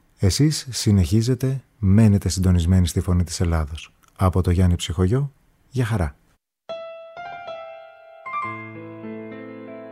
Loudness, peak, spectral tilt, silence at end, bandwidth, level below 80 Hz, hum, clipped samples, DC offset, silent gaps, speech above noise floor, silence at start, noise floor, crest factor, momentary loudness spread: -21 LUFS; -4 dBFS; -6 dB/octave; 0 s; 15 kHz; -36 dBFS; none; under 0.1%; under 0.1%; none; 25 dB; 0.2 s; -44 dBFS; 18 dB; 19 LU